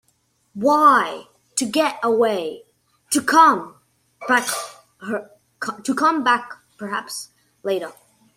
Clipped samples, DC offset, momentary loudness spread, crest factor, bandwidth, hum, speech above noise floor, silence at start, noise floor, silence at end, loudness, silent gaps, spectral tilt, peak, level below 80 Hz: under 0.1%; under 0.1%; 23 LU; 20 dB; 16.5 kHz; none; 46 dB; 0.55 s; -65 dBFS; 0.45 s; -19 LUFS; none; -2.5 dB/octave; -2 dBFS; -70 dBFS